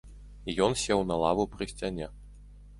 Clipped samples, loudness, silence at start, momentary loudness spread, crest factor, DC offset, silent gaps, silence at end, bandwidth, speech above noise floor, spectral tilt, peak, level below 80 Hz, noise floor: under 0.1%; -29 LUFS; 0.05 s; 13 LU; 22 dB; under 0.1%; none; 0 s; 11.5 kHz; 21 dB; -4.5 dB/octave; -10 dBFS; -48 dBFS; -49 dBFS